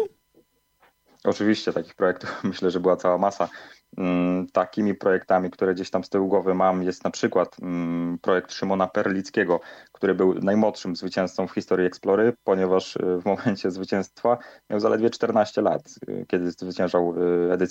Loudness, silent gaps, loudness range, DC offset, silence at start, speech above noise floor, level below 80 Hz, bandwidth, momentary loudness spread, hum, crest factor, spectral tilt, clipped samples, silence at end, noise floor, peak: -24 LUFS; none; 2 LU; under 0.1%; 0 s; 40 dB; -68 dBFS; 8.2 kHz; 7 LU; none; 16 dB; -6.5 dB/octave; under 0.1%; 0 s; -63 dBFS; -6 dBFS